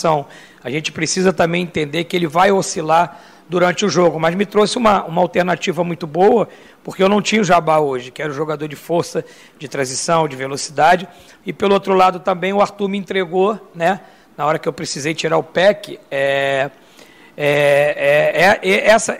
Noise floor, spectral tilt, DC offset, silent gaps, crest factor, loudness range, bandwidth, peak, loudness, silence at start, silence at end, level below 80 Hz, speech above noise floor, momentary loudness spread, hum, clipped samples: -44 dBFS; -4.5 dB/octave; under 0.1%; none; 14 dB; 3 LU; 16 kHz; -2 dBFS; -16 LUFS; 0 s; 0 s; -52 dBFS; 28 dB; 11 LU; none; under 0.1%